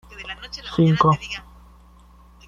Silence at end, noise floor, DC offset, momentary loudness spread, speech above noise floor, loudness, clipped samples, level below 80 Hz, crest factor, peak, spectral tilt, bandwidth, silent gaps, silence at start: 1.1 s; -49 dBFS; under 0.1%; 17 LU; 29 dB; -20 LUFS; under 0.1%; -46 dBFS; 20 dB; -4 dBFS; -7 dB/octave; 7.4 kHz; none; 0.1 s